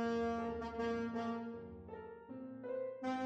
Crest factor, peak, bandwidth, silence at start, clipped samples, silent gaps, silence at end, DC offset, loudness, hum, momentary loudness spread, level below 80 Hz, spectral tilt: 14 dB; -28 dBFS; 8.2 kHz; 0 s; under 0.1%; none; 0 s; under 0.1%; -43 LUFS; none; 13 LU; -64 dBFS; -6.5 dB/octave